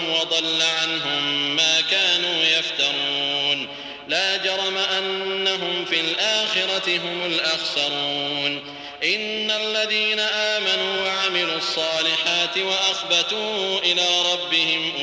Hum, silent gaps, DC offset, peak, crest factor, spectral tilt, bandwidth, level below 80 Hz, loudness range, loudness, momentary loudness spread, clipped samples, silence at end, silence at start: none; none; under 0.1%; -6 dBFS; 16 dB; -1 dB/octave; 8 kHz; -66 dBFS; 3 LU; -20 LUFS; 5 LU; under 0.1%; 0 s; 0 s